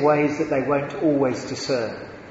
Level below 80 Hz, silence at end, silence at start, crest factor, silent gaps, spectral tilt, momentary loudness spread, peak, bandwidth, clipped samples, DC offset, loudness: -56 dBFS; 0 s; 0 s; 16 dB; none; -6 dB/octave; 8 LU; -6 dBFS; 8 kHz; under 0.1%; under 0.1%; -23 LUFS